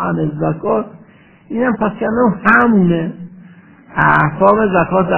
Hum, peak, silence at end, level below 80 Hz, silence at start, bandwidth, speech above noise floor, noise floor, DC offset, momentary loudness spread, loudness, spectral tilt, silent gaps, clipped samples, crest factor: none; 0 dBFS; 0 s; -44 dBFS; 0 s; 4 kHz; 31 dB; -44 dBFS; 0.3%; 14 LU; -14 LUFS; -11.5 dB/octave; none; under 0.1%; 14 dB